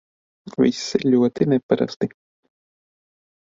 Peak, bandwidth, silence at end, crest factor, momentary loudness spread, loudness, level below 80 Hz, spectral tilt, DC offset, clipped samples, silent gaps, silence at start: -4 dBFS; 7.6 kHz; 1.5 s; 20 dB; 10 LU; -21 LUFS; -62 dBFS; -6 dB/octave; under 0.1%; under 0.1%; 1.63-1.69 s, 1.96-2.00 s; 0.45 s